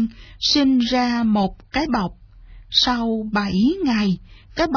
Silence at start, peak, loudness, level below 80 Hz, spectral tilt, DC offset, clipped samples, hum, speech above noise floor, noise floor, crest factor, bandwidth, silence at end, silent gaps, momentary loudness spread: 0 s; -4 dBFS; -20 LUFS; -42 dBFS; -5 dB/octave; under 0.1%; under 0.1%; none; 23 dB; -43 dBFS; 16 dB; 5.4 kHz; 0 s; none; 8 LU